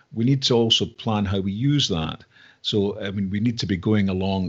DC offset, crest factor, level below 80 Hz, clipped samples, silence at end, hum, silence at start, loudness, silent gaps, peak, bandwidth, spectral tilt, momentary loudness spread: under 0.1%; 18 dB; -52 dBFS; under 0.1%; 0 s; none; 0.1 s; -22 LUFS; none; -6 dBFS; 8 kHz; -5.5 dB/octave; 8 LU